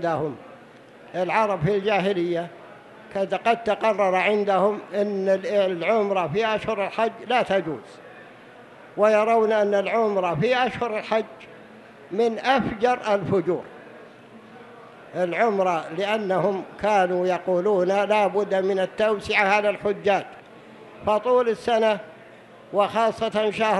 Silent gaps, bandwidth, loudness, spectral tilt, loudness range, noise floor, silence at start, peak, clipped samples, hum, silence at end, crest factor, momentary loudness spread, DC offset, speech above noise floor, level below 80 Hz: none; 11.5 kHz; -23 LUFS; -6 dB/octave; 4 LU; -47 dBFS; 0 s; -6 dBFS; under 0.1%; none; 0 s; 18 dB; 9 LU; under 0.1%; 25 dB; -60 dBFS